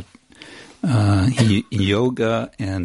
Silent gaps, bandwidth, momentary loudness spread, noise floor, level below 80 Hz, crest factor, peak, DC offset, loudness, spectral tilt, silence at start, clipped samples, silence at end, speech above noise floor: none; 11.5 kHz; 10 LU; -44 dBFS; -50 dBFS; 16 dB; -2 dBFS; under 0.1%; -19 LUFS; -6.5 dB/octave; 0 s; under 0.1%; 0 s; 26 dB